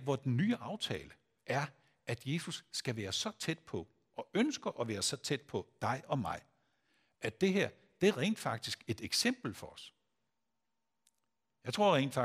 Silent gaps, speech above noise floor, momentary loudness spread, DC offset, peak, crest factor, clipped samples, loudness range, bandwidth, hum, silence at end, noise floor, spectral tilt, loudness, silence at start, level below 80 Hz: none; 53 dB; 13 LU; under 0.1%; -16 dBFS; 22 dB; under 0.1%; 4 LU; 15.5 kHz; none; 0 s; -88 dBFS; -4.5 dB/octave; -36 LUFS; 0 s; -72 dBFS